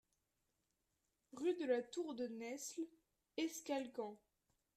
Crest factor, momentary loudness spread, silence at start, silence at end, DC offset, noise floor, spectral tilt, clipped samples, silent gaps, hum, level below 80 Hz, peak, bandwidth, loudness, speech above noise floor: 20 dB; 12 LU; 1.35 s; 0.6 s; under 0.1%; -87 dBFS; -3 dB/octave; under 0.1%; none; none; -88 dBFS; -26 dBFS; 15 kHz; -45 LUFS; 44 dB